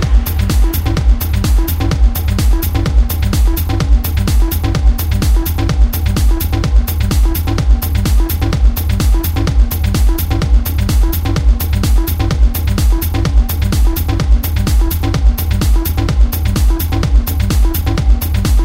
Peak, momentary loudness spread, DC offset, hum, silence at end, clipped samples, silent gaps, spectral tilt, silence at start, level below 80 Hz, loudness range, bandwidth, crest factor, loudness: 0 dBFS; 1 LU; under 0.1%; none; 0 s; under 0.1%; none; -5.5 dB/octave; 0 s; -12 dBFS; 0 LU; 16.5 kHz; 10 dB; -14 LUFS